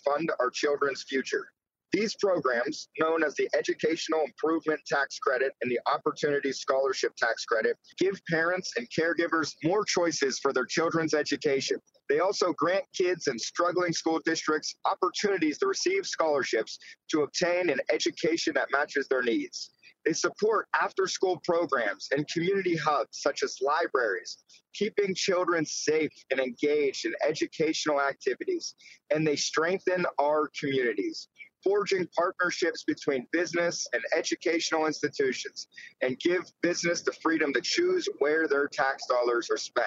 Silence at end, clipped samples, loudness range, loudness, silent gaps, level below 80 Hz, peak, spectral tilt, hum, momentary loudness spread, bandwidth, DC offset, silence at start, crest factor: 0 s; under 0.1%; 1 LU; -28 LUFS; none; -80 dBFS; -10 dBFS; -3.5 dB/octave; none; 5 LU; 8 kHz; under 0.1%; 0.05 s; 18 dB